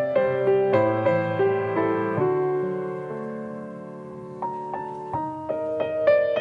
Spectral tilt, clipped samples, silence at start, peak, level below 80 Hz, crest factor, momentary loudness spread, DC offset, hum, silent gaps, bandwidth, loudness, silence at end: -8.5 dB/octave; under 0.1%; 0 s; -8 dBFS; -60 dBFS; 16 dB; 15 LU; under 0.1%; none; none; 5.2 kHz; -24 LUFS; 0 s